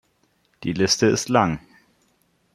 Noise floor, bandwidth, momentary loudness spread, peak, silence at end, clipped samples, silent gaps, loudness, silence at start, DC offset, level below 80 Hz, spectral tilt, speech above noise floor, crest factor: -65 dBFS; 15.5 kHz; 13 LU; -2 dBFS; 0.95 s; under 0.1%; none; -21 LUFS; 0.6 s; under 0.1%; -54 dBFS; -4 dB/octave; 45 dB; 22 dB